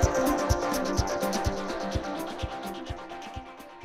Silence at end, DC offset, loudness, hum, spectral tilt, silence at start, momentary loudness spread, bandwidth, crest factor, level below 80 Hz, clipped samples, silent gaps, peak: 0 s; under 0.1%; -30 LUFS; none; -5 dB/octave; 0 s; 14 LU; 16.5 kHz; 22 dB; -38 dBFS; under 0.1%; none; -8 dBFS